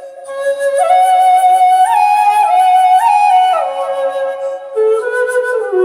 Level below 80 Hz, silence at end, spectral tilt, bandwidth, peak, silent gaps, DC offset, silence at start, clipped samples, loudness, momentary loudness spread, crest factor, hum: -68 dBFS; 0 s; -1 dB/octave; 15.5 kHz; -2 dBFS; none; under 0.1%; 0 s; under 0.1%; -11 LUFS; 10 LU; 10 dB; none